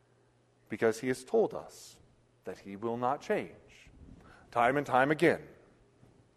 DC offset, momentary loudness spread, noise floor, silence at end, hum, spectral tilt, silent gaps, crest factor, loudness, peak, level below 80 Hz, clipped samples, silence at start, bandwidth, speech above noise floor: under 0.1%; 20 LU; -68 dBFS; 0.85 s; none; -5.5 dB/octave; none; 22 dB; -31 LUFS; -12 dBFS; -66 dBFS; under 0.1%; 0.7 s; 13 kHz; 36 dB